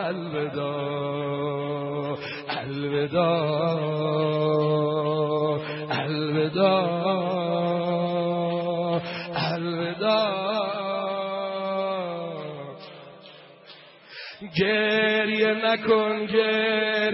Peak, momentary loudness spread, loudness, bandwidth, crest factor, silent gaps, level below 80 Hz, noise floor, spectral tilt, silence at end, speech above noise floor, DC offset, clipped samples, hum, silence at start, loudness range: -8 dBFS; 9 LU; -25 LUFS; 5.8 kHz; 16 dB; none; -68 dBFS; -49 dBFS; -10 dB/octave; 0 s; 24 dB; under 0.1%; under 0.1%; none; 0 s; 6 LU